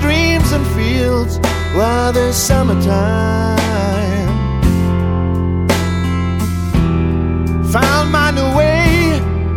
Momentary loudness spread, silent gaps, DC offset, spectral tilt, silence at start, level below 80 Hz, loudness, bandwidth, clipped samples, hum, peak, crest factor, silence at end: 4 LU; none; under 0.1%; -5.5 dB/octave; 0 s; -22 dBFS; -14 LUFS; 16.5 kHz; under 0.1%; none; 0 dBFS; 12 dB; 0 s